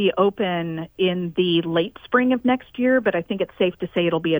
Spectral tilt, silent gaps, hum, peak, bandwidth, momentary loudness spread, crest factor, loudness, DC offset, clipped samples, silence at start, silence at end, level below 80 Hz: -8.5 dB/octave; none; none; -4 dBFS; over 20 kHz; 5 LU; 18 dB; -22 LUFS; under 0.1%; under 0.1%; 0 s; 0 s; -58 dBFS